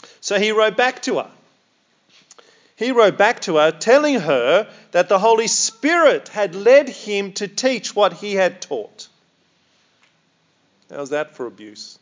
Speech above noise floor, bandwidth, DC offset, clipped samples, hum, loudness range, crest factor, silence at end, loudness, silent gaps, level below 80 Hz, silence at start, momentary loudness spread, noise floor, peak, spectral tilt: 45 dB; 7.8 kHz; under 0.1%; under 0.1%; none; 11 LU; 18 dB; 0.1 s; -17 LUFS; none; -84 dBFS; 0.25 s; 15 LU; -62 dBFS; 0 dBFS; -2.5 dB/octave